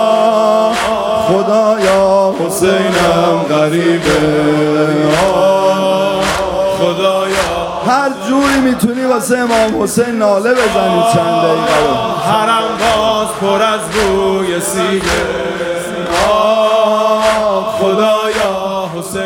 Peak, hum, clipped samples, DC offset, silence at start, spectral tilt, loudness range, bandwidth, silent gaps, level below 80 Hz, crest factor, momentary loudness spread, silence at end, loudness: 0 dBFS; none; under 0.1%; under 0.1%; 0 s; -4.5 dB/octave; 2 LU; 17.5 kHz; none; -38 dBFS; 12 dB; 4 LU; 0 s; -12 LUFS